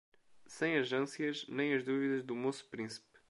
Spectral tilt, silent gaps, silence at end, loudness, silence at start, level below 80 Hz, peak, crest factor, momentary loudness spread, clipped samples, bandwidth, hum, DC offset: -5 dB/octave; none; 0.3 s; -36 LUFS; 0.3 s; -84 dBFS; -20 dBFS; 18 dB; 10 LU; under 0.1%; 11.5 kHz; none; under 0.1%